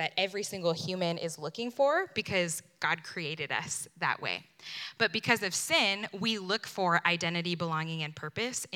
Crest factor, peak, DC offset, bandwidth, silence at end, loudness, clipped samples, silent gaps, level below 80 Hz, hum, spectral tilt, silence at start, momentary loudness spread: 24 dB; -8 dBFS; under 0.1%; 17.5 kHz; 0 s; -31 LUFS; under 0.1%; none; -78 dBFS; none; -3 dB/octave; 0 s; 10 LU